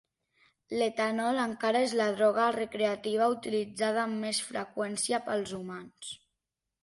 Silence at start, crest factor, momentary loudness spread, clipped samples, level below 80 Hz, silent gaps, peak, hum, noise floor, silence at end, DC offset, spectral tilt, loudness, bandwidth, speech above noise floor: 0.7 s; 16 dB; 14 LU; under 0.1%; -74 dBFS; none; -14 dBFS; none; -87 dBFS; 0.7 s; under 0.1%; -3.5 dB/octave; -30 LUFS; 11.5 kHz; 57 dB